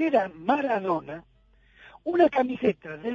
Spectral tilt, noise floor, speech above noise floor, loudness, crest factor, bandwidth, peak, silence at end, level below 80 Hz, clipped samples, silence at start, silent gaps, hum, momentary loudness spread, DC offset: -7.5 dB/octave; -58 dBFS; 33 dB; -25 LUFS; 18 dB; 7 kHz; -8 dBFS; 0 s; -62 dBFS; under 0.1%; 0 s; none; none; 14 LU; under 0.1%